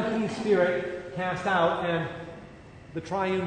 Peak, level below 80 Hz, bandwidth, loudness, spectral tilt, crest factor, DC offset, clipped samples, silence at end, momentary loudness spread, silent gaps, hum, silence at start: -12 dBFS; -58 dBFS; 9.6 kHz; -27 LUFS; -6 dB/octave; 16 dB; under 0.1%; under 0.1%; 0 s; 19 LU; none; none; 0 s